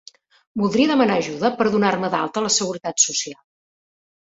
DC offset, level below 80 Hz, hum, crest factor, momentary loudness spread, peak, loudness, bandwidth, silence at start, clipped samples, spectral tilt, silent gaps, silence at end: under 0.1%; -62 dBFS; none; 18 dB; 8 LU; -4 dBFS; -19 LUFS; 8.4 kHz; 0.55 s; under 0.1%; -3 dB/octave; none; 1 s